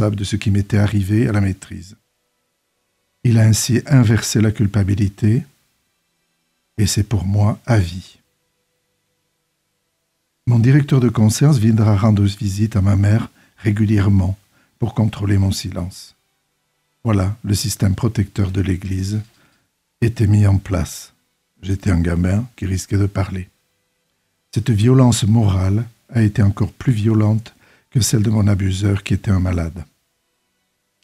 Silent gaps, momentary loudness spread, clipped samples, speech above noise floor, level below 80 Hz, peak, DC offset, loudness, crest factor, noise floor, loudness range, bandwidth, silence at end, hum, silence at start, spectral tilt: none; 12 LU; under 0.1%; 54 dB; -44 dBFS; -2 dBFS; under 0.1%; -17 LUFS; 16 dB; -70 dBFS; 6 LU; 14 kHz; 1.2 s; none; 0 s; -6.5 dB/octave